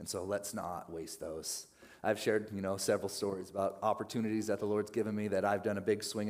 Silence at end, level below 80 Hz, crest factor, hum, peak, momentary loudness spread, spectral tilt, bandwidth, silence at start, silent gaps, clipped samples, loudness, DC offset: 0 s; -74 dBFS; 18 dB; none; -18 dBFS; 9 LU; -4.5 dB/octave; 16 kHz; 0 s; none; under 0.1%; -36 LUFS; under 0.1%